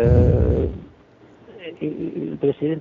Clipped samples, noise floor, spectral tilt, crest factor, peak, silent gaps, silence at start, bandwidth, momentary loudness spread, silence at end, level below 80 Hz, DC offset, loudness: under 0.1%; -49 dBFS; -9.5 dB/octave; 18 dB; -4 dBFS; none; 0 s; 4.7 kHz; 22 LU; 0 s; -30 dBFS; under 0.1%; -21 LUFS